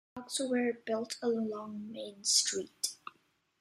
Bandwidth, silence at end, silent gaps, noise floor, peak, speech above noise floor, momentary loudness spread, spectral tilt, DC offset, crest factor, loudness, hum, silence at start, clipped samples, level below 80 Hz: 15.5 kHz; 0.5 s; none; -72 dBFS; -14 dBFS; 38 dB; 16 LU; -1.5 dB/octave; under 0.1%; 22 dB; -33 LUFS; none; 0.15 s; under 0.1%; -80 dBFS